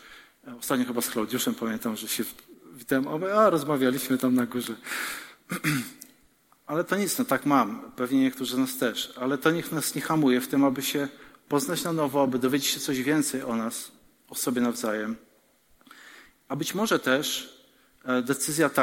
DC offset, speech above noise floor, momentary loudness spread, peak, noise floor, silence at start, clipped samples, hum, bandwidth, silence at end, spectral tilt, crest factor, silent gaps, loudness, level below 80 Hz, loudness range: under 0.1%; 36 dB; 11 LU; -6 dBFS; -62 dBFS; 0.05 s; under 0.1%; none; 17 kHz; 0 s; -4 dB/octave; 20 dB; none; -27 LUFS; -70 dBFS; 4 LU